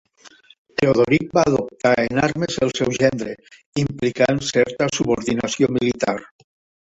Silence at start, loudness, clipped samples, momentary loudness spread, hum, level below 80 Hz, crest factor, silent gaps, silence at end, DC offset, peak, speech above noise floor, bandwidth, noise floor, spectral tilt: 0.25 s; -20 LUFS; under 0.1%; 9 LU; none; -50 dBFS; 18 dB; 0.58-0.65 s, 3.66-3.73 s; 0.55 s; under 0.1%; -2 dBFS; 30 dB; 8.2 kHz; -49 dBFS; -5 dB/octave